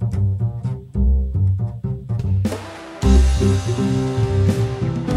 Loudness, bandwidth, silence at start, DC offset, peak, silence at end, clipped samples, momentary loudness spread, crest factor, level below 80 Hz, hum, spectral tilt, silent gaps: -20 LUFS; 11.5 kHz; 0 s; under 0.1%; -2 dBFS; 0 s; under 0.1%; 9 LU; 16 dB; -22 dBFS; none; -7.5 dB/octave; none